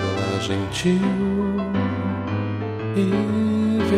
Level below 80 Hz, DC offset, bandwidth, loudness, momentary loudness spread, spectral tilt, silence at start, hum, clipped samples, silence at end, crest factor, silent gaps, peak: -46 dBFS; under 0.1%; 11 kHz; -22 LUFS; 5 LU; -6.5 dB/octave; 0 s; none; under 0.1%; 0 s; 14 dB; none; -8 dBFS